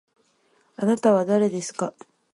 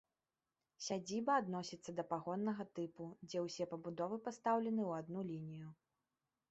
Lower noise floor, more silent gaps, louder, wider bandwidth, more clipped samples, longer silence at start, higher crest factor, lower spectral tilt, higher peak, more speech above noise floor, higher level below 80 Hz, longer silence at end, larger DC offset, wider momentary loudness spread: second, -64 dBFS vs under -90 dBFS; neither; first, -23 LUFS vs -42 LUFS; first, 11.5 kHz vs 8 kHz; neither; about the same, 0.8 s vs 0.8 s; about the same, 18 dB vs 20 dB; about the same, -6 dB/octave vs -5 dB/octave; first, -6 dBFS vs -24 dBFS; second, 43 dB vs over 48 dB; first, -72 dBFS vs -84 dBFS; second, 0.45 s vs 0.75 s; neither; about the same, 11 LU vs 11 LU